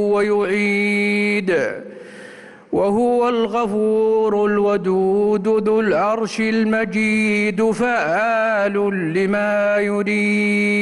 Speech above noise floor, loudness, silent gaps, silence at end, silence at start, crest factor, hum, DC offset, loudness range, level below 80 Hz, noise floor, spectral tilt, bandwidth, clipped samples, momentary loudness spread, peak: 22 dB; -18 LUFS; none; 0 s; 0 s; 8 dB; none; under 0.1%; 2 LU; -56 dBFS; -40 dBFS; -6 dB/octave; 11.5 kHz; under 0.1%; 3 LU; -8 dBFS